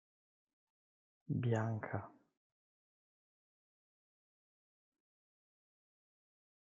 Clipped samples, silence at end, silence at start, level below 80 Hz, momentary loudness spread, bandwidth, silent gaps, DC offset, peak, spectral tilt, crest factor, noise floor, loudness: under 0.1%; 4.6 s; 1.3 s; -84 dBFS; 10 LU; 5.6 kHz; none; under 0.1%; -22 dBFS; -8 dB/octave; 24 dB; under -90 dBFS; -40 LUFS